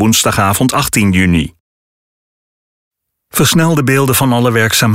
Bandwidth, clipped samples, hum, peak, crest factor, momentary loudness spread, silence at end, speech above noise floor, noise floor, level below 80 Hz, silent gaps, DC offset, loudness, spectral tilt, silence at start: 16.5 kHz; under 0.1%; none; -2 dBFS; 12 dB; 3 LU; 0 s; over 79 dB; under -90 dBFS; -36 dBFS; 1.60-2.91 s; under 0.1%; -11 LUFS; -4 dB/octave; 0 s